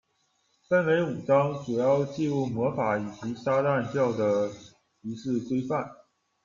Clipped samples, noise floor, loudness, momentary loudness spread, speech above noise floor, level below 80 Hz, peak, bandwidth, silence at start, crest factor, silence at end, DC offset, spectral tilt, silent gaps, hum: under 0.1%; -72 dBFS; -27 LUFS; 10 LU; 46 dB; -66 dBFS; -10 dBFS; 7.4 kHz; 0.7 s; 18 dB; 0.5 s; under 0.1%; -7.5 dB/octave; none; none